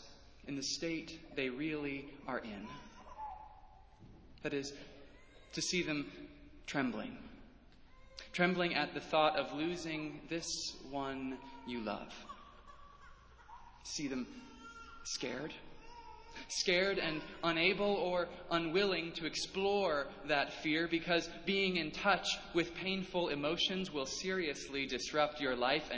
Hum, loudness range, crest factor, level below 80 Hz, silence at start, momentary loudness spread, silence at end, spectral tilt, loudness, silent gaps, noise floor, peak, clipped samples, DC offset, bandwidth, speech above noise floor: none; 11 LU; 22 dB; -62 dBFS; 0 s; 20 LU; 0 s; -3.5 dB/octave; -37 LUFS; none; -60 dBFS; -16 dBFS; under 0.1%; under 0.1%; 8 kHz; 22 dB